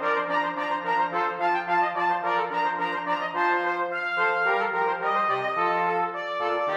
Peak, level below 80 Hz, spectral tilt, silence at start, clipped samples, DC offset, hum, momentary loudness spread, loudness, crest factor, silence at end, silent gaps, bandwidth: -12 dBFS; -80 dBFS; -5 dB/octave; 0 s; under 0.1%; under 0.1%; none; 4 LU; -25 LUFS; 12 dB; 0 s; none; 8.8 kHz